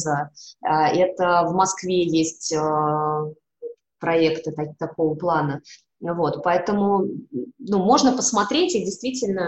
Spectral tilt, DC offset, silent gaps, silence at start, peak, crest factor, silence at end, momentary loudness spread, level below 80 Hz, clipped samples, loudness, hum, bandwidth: -4.5 dB/octave; under 0.1%; none; 0 s; -6 dBFS; 16 dB; 0 s; 14 LU; -60 dBFS; under 0.1%; -22 LUFS; none; 8.8 kHz